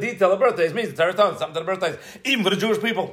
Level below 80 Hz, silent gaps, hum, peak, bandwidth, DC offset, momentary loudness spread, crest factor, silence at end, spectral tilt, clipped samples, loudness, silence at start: -68 dBFS; none; none; -4 dBFS; 16 kHz; under 0.1%; 8 LU; 16 dB; 0 s; -4.5 dB/octave; under 0.1%; -21 LUFS; 0 s